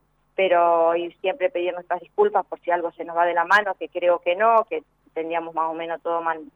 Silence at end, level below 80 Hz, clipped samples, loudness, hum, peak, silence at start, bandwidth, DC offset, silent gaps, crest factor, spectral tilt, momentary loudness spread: 0.1 s; -70 dBFS; under 0.1%; -22 LUFS; none; -6 dBFS; 0.4 s; 7.8 kHz; under 0.1%; none; 16 dB; -5 dB/octave; 10 LU